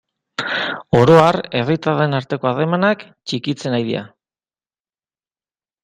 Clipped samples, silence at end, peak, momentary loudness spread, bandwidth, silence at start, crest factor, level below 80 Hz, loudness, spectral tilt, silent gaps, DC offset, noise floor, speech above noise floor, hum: under 0.1%; 1.75 s; 0 dBFS; 14 LU; 10.5 kHz; 0.4 s; 18 dB; -52 dBFS; -17 LUFS; -6.5 dB/octave; none; under 0.1%; under -90 dBFS; over 74 dB; none